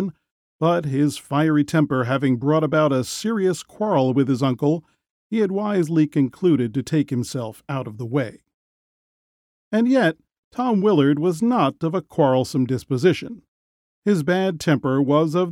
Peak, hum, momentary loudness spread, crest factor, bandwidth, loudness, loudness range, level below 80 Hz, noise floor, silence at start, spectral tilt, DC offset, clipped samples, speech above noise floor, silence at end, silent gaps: -4 dBFS; none; 9 LU; 16 dB; 15.5 kHz; -21 LUFS; 5 LU; -62 dBFS; under -90 dBFS; 0 s; -7 dB/octave; under 0.1%; under 0.1%; over 70 dB; 0 s; 0.31-0.59 s, 5.11-5.30 s, 8.54-9.71 s, 10.38-10.51 s, 13.48-14.02 s